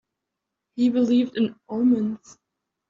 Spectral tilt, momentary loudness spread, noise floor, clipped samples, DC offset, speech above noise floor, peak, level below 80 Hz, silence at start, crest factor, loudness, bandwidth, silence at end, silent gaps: -6 dB/octave; 12 LU; -83 dBFS; under 0.1%; under 0.1%; 61 dB; -10 dBFS; -70 dBFS; 0.75 s; 14 dB; -23 LUFS; 7.4 kHz; 0.75 s; none